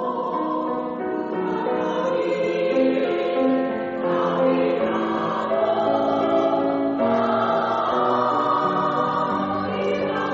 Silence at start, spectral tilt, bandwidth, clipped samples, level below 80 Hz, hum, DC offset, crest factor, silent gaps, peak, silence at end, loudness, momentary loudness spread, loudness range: 0 s; -4.5 dB/octave; 7.6 kHz; under 0.1%; -62 dBFS; none; under 0.1%; 14 dB; none; -8 dBFS; 0 s; -22 LUFS; 5 LU; 2 LU